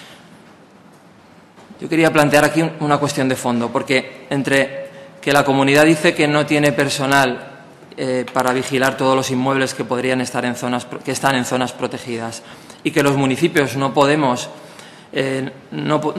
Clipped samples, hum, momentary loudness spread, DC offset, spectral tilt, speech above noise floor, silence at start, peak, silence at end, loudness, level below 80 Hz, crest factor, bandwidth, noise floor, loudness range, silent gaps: under 0.1%; none; 13 LU; under 0.1%; -4.5 dB/octave; 29 dB; 0 s; 0 dBFS; 0 s; -17 LUFS; -56 dBFS; 18 dB; 13.5 kHz; -46 dBFS; 4 LU; none